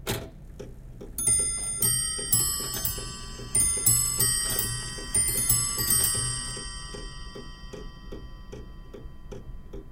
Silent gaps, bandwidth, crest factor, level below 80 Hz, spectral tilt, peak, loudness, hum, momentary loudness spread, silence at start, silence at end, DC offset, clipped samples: none; 17 kHz; 22 dB; -42 dBFS; -1.5 dB/octave; -6 dBFS; -24 LUFS; none; 23 LU; 0 s; 0 s; under 0.1%; under 0.1%